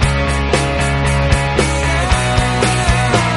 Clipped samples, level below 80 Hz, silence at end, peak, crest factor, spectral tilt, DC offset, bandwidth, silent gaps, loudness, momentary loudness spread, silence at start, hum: under 0.1%; -20 dBFS; 0 s; 0 dBFS; 14 dB; -4.5 dB/octave; under 0.1%; 11.5 kHz; none; -15 LUFS; 2 LU; 0 s; none